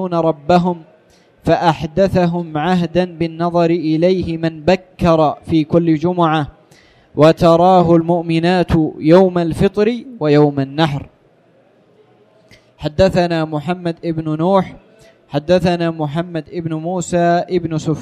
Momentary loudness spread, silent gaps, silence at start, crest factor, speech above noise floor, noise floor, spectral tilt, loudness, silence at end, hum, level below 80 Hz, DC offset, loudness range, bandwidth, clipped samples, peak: 11 LU; none; 0 s; 14 dB; 37 dB; -52 dBFS; -7.5 dB/octave; -15 LUFS; 0 s; none; -40 dBFS; under 0.1%; 6 LU; 11 kHz; under 0.1%; 0 dBFS